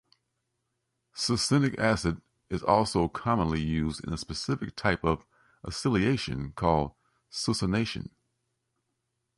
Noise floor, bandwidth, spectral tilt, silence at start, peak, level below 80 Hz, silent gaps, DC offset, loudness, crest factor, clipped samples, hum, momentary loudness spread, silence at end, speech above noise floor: -80 dBFS; 11.5 kHz; -5 dB/octave; 1.15 s; -8 dBFS; -46 dBFS; none; under 0.1%; -29 LUFS; 22 dB; under 0.1%; none; 13 LU; 1.35 s; 53 dB